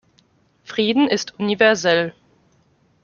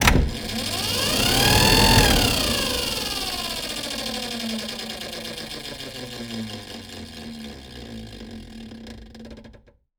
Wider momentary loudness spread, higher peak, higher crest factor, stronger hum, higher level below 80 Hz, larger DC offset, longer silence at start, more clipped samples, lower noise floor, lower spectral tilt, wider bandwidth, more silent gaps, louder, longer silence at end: second, 10 LU vs 24 LU; about the same, -2 dBFS vs 0 dBFS; about the same, 20 dB vs 24 dB; neither; second, -64 dBFS vs -32 dBFS; neither; first, 0.7 s vs 0 s; neither; first, -60 dBFS vs -51 dBFS; about the same, -4 dB/octave vs -3 dB/octave; second, 7.2 kHz vs over 20 kHz; neither; first, -18 LUFS vs -21 LUFS; first, 0.9 s vs 0.45 s